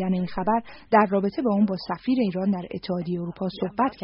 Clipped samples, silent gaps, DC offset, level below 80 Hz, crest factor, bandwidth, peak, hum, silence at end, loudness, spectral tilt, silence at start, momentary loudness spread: under 0.1%; none; under 0.1%; -54 dBFS; 18 dB; 5.6 kHz; -6 dBFS; none; 0 s; -25 LUFS; -6 dB/octave; 0 s; 9 LU